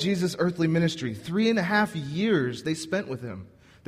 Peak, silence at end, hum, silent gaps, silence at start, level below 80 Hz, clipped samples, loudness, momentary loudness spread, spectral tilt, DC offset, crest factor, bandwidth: -10 dBFS; 0.4 s; none; none; 0 s; -62 dBFS; under 0.1%; -26 LUFS; 11 LU; -6 dB/octave; under 0.1%; 16 dB; 15 kHz